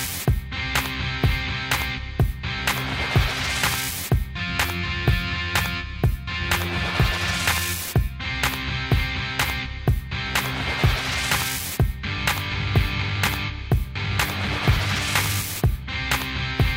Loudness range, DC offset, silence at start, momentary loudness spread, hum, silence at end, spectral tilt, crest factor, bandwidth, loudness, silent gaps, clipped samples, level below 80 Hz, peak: 1 LU; under 0.1%; 0 s; 4 LU; none; 0 s; -4 dB/octave; 18 dB; 16.5 kHz; -24 LUFS; none; under 0.1%; -30 dBFS; -6 dBFS